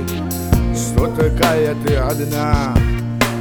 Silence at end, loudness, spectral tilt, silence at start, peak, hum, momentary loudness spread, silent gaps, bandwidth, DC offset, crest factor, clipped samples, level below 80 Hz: 0 s; -17 LUFS; -5.5 dB/octave; 0 s; 0 dBFS; none; 4 LU; none; over 20 kHz; 0.3%; 16 dB; under 0.1%; -24 dBFS